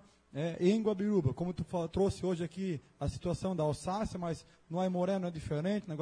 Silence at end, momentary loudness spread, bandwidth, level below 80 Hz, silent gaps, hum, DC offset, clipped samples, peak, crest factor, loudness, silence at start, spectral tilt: 0 s; 8 LU; 10.5 kHz; -54 dBFS; none; none; under 0.1%; under 0.1%; -16 dBFS; 18 dB; -35 LUFS; 0.35 s; -7.5 dB/octave